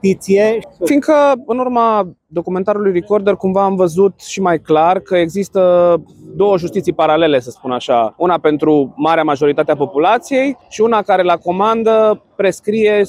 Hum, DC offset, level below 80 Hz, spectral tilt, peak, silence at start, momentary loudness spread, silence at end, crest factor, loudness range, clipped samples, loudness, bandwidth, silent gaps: none; under 0.1%; -54 dBFS; -6 dB/octave; -2 dBFS; 0.05 s; 6 LU; 0 s; 12 dB; 1 LU; under 0.1%; -14 LUFS; 15 kHz; none